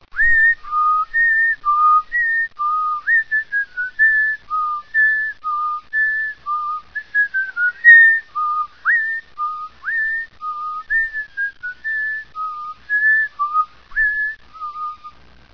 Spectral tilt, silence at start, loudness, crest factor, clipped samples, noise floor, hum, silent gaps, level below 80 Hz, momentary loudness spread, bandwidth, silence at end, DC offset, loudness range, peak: -2 dB/octave; 0.15 s; -16 LUFS; 18 dB; under 0.1%; -42 dBFS; none; none; -46 dBFS; 14 LU; 5.4 kHz; 0.45 s; 0.4%; 7 LU; 0 dBFS